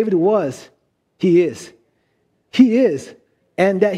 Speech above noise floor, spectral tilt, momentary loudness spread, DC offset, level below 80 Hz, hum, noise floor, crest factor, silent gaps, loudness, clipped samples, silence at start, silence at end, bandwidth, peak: 50 dB; -7 dB/octave; 17 LU; under 0.1%; -64 dBFS; none; -65 dBFS; 16 dB; none; -17 LUFS; under 0.1%; 0 s; 0 s; 11.5 kHz; 0 dBFS